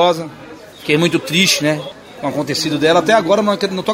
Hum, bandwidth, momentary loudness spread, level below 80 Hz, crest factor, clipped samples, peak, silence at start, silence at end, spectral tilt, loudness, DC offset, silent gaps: none; 16 kHz; 14 LU; -54 dBFS; 16 dB; under 0.1%; 0 dBFS; 0 s; 0 s; -4 dB/octave; -15 LUFS; under 0.1%; none